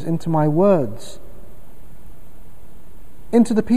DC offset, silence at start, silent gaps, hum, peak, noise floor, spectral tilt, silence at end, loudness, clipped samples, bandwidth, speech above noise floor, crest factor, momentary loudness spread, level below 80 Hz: 6%; 0 s; none; none; -4 dBFS; -45 dBFS; -8 dB/octave; 0 s; -18 LUFS; under 0.1%; 15 kHz; 28 dB; 18 dB; 18 LU; -46 dBFS